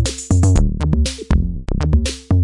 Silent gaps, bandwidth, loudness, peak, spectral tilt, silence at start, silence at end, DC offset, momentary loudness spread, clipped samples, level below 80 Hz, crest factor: none; 11.5 kHz; -18 LUFS; -2 dBFS; -6 dB/octave; 0 s; 0 s; under 0.1%; 5 LU; under 0.1%; -20 dBFS; 12 dB